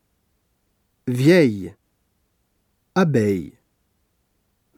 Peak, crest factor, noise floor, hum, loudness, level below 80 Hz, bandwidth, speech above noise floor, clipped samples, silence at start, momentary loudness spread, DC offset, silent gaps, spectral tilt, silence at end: -4 dBFS; 20 dB; -69 dBFS; none; -19 LUFS; -62 dBFS; 16 kHz; 51 dB; under 0.1%; 1.05 s; 19 LU; under 0.1%; none; -7 dB/octave; 1.3 s